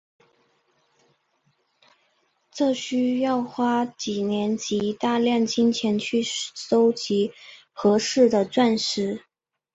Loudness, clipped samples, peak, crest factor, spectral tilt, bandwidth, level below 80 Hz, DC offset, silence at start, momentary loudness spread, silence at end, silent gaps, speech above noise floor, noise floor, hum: -23 LUFS; under 0.1%; -6 dBFS; 18 dB; -4.5 dB/octave; 8 kHz; -66 dBFS; under 0.1%; 2.55 s; 8 LU; 0.55 s; none; 46 dB; -69 dBFS; none